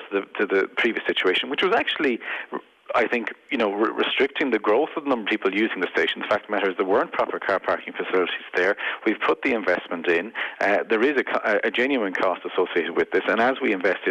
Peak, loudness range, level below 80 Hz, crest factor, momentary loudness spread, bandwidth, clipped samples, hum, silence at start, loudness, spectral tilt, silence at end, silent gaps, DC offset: -10 dBFS; 1 LU; -66 dBFS; 12 dB; 4 LU; 9.2 kHz; under 0.1%; none; 0 s; -23 LUFS; -5 dB/octave; 0 s; none; under 0.1%